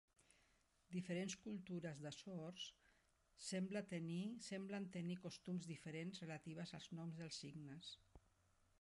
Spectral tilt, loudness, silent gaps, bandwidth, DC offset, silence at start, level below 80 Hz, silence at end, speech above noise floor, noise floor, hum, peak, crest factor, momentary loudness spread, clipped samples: -5 dB/octave; -51 LUFS; none; 11.5 kHz; under 0.1%; 0.2 s; -82 dBFS; 0.65 s; 29 dB; -79 dBFS; none; -36 dBFS; 16 dB; 8 LU; under 0.1%